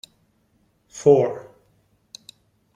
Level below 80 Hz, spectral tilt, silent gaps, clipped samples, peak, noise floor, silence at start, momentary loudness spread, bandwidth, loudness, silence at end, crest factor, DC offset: -64 dBFS; -6.5 dB/octave; none; under 0.1%; -4 dBFS; -65 dBFS; 0.95 s; 26 LU; 10 kHz; -19 LUFS; 1.35 s; 22 dB; under 0.1%